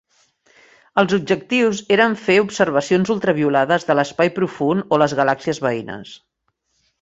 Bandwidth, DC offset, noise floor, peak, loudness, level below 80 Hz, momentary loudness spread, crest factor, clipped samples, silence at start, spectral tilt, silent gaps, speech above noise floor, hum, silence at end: 8 kHz; under 0.1%; -70 dBFS; -2 dBFS; -18 LUFS; -58 dBFS; 6 LU; 18 dB; under 0.1%; 0.95 s; -5.5 dB/octave; none; 52 dB; none; 0.85 s